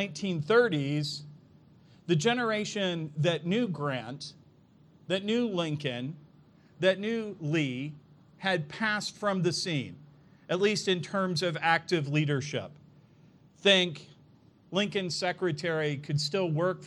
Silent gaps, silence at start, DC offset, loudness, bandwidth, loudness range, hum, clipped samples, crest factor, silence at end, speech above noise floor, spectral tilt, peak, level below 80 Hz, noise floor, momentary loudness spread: none; 0 s; under 0.1%; -29 LUFS; 12 kHz; 3 LU; none; under 0.1%; 22 dB; 0 s; 30 dB; -5 dB/octave; -8 dBFS; -74 dBFS; -59 dBFS; 11 LU